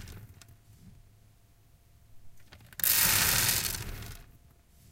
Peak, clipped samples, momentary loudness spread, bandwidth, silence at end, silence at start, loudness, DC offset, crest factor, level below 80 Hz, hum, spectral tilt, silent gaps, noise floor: -6 dBFS; under 0.1%; 24 LU; 17 kHz; 0.7 s; 0 s; -25 LUFS; under 0.1%; 26 dB; -50 dBFS; none; -0.5 dB/octave; none; -61 dBFS